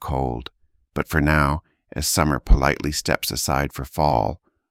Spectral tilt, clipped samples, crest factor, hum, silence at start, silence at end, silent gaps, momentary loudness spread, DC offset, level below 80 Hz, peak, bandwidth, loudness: -4.5 dB/octave; under 0.1%; 20 dB; none; 0 s; 0.35 s; none; 13 LU; under 0.1%; -28 dBFS; -2 dBFS; 17 kHz; -22 LUFS